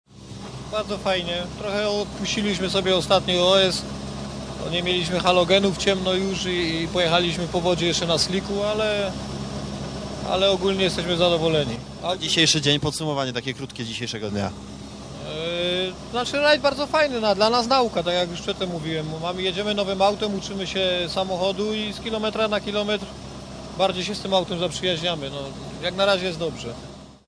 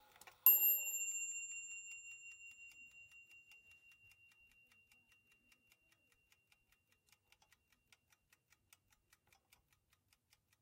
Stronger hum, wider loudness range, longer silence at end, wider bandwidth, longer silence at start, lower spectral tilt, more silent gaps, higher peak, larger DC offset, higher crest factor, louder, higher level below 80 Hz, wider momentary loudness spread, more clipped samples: neither; second, 4 LU vs 26 LU; second, 0.1 s vs 7.4 s; second, 11 kHz vs 16 kHz; second, 0.15 s vs 0.45 s; first, -4 dB/octave vs 2.5 dB/octave; neither; first, -2 dBFS vs -14 dBFS; neither; second, 22 dB vs 32 dB; first, -23 LUFS vs -34 LUFS; first, -46 dBFS vs -88 dBFS; second, 13 LU vs 28 LU; neither